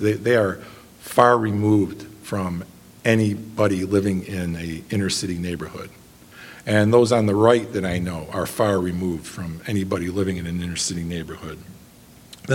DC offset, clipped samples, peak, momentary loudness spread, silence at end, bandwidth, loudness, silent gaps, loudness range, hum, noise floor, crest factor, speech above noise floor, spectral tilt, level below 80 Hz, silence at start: under 0.1%; under 0.1%; 0 dBFS; 19 LU; 0 s; 17 kHz; -22 LUFS; none; 5 LU; none; -47 dBFS; 22 dB; 26 dB; -5.5 dB/octave; -50 dBFS; 0 s